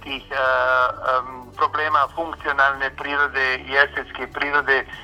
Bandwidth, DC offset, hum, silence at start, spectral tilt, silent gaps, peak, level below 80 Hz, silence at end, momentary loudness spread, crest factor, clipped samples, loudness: 15 kHz; under 0.1%; none; 0 s; -4 dB/octave; none; -2 dBFS; -48 dBFS; 0 s; 8 LU; 20 dB; under 0.1%; -20 LUFS